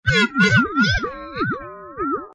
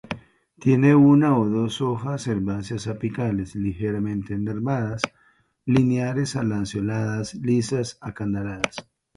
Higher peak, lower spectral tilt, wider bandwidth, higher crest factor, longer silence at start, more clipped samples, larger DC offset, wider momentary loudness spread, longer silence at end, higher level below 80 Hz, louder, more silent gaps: second, -6 dBFS vs 0 dBFS; second, -5 dB/octave vs -7 dB/octave; about the same, 10.5 kHz vs 11.5 kHz; second, 14 dB vs 22 dB; about the same, 0.05 s vs 0.1 s; neither; neither; about the same, 13 LU vs 12 LU; second, 0.05 s vs 0.35 s; first, -38 dBFS vs -50 dBFS; first, -19 LUFS vs -23 LUFS; neither